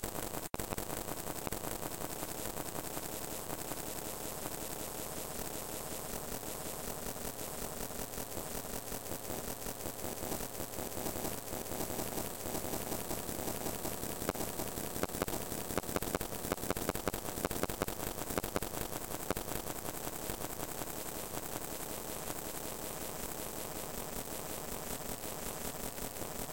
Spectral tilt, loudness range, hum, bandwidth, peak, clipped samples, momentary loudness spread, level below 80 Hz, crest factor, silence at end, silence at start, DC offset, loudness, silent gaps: -3.5 dB/octave; 3 LU; none; 17 kHz; -14 dBFS; under 0.1%; 4 LU; -54 dBFS; 26 dB; 0 s; 0 s; 0.3%; -39 LUFS; none